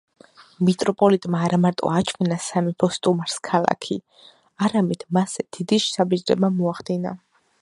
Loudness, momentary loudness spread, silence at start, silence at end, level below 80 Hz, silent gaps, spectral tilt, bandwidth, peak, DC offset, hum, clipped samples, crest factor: -22 LUFS; 8 LU; 0.6 s; 0.45 s; -62 dBFS; none; -5.5 dB/octave; 11.5 kHz; 0 dBFS; under 0.1%; none; under 0.1%; 22 dB